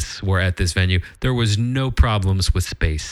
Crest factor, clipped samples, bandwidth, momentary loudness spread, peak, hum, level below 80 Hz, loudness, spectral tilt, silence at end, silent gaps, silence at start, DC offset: 18 dB; under 0.1%; 13 kHz; 4 LU; -2 dBFS; none; -26 dBFS; -20 LUFS; -5 dB/octave; 0 s; none; 0 s; under 0.1%